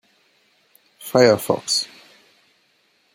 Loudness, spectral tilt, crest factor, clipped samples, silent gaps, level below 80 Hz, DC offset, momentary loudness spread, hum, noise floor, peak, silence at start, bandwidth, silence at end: -18 LUFS; -3.5 dB/octave; 22 dB; under 0.1%; none; -64 dBFS; under 0.1%; 17 LU; none; -63 dBFS; -2 dBFS; 1 s; 16.5 kHz; 1.3 s